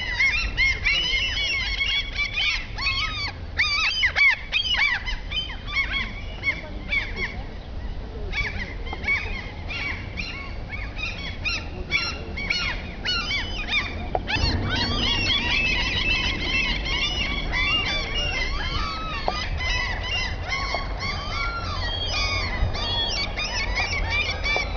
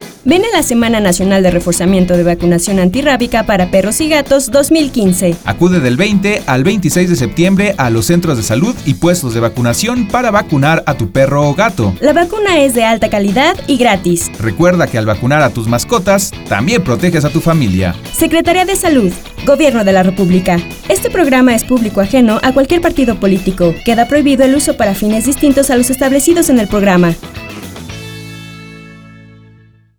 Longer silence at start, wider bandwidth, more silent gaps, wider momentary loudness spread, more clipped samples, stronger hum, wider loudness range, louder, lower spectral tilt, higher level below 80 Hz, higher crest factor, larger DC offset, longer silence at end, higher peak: about the same, 0 s vs 0 s; second, 5.4 kHz vs over 20 kHz; neither; first, 10 LU vs 5 LU; neither; neither; first, 7 LU vs 2 LU; second, -23 LUFS vs -11 LUFS; second, -3 dB/octave vs -5 dB/octave; about the same, -32 dBFS vs -32 dBFS; first, 20 dB vs 10 dB; second, under 0.1% vs 0.2%; second, 0 s vs 0.9 s; second, -6 dBFS vs 0 dBFS